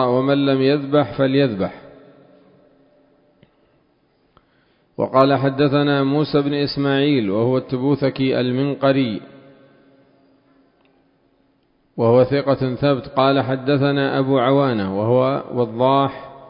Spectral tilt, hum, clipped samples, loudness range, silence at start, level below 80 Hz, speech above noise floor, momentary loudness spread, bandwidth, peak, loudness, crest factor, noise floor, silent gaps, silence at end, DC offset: -10.5 dB/octave; none; under 0.1%; 8 LU; 0 s; -54 dBFS; 44 dB; 5 LU; 5.4 kHz; 0 dBFS; -18 LUFS; 20 dB; -61 dBFS; none; 0.05 s; under 0.1%